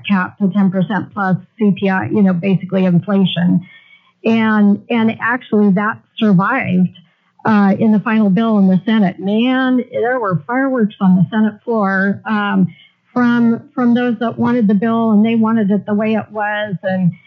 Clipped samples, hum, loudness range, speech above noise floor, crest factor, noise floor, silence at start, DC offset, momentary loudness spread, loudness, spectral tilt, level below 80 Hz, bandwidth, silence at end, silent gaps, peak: under 0.1%; none; 2 LU; 29 dB; 12 dB; -43 dBFS; 0.05 s; under 0.1%; 5 LU; -15 LUFS; -9.5 dB/octave; -70 dBFS; 5.2 kHz; 0.15 s; none; -4 dBFS